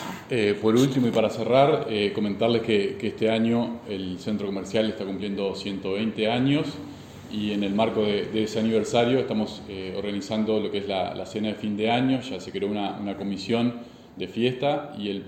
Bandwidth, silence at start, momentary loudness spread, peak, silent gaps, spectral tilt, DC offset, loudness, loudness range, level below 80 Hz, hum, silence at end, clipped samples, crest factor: 15.5 kHz; 0 s; 10 LU; -4 dBFS; none; -6 dB/octave; under 0.1%; -25 LUFS; 4 LU; -60 dBFS; none; 0 s; under 0.1%; 20 dB